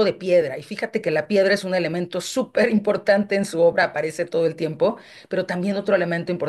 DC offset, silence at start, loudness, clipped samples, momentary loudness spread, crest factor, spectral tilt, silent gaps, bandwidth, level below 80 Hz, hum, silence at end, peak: under 0.1%; 0 s; -21 LUFS; under 0.1%; 8 LU; 16 dB; -5.5 dB/octave; none; 12.5 kHz; -66 dBFS; none; 0 s; -6 dBFS